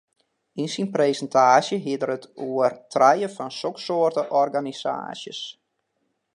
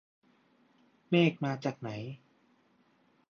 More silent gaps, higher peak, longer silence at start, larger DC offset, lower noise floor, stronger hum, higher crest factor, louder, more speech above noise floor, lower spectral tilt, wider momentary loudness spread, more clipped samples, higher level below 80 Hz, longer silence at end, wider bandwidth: neither; first, -4 dBFS vs -14 dBFS; second, 0.55 s vs 1.1 s; neither; first, -74 dBFS vs -69 dBFS; neither; about the same, 20 dB vs 22 dB; first, -23 LUFS vs -31 LUFS; first, 52 dB vs 38 dB; second, -4.5 dB/octave vs -7.5 dB/octave; second, 14 LU vs 17 LU; neither; about the same, -78 dBFS vs -78 dBFS; second, 0.85 s vs 1.15 s; first, 11 kHz vs 6.8 kHz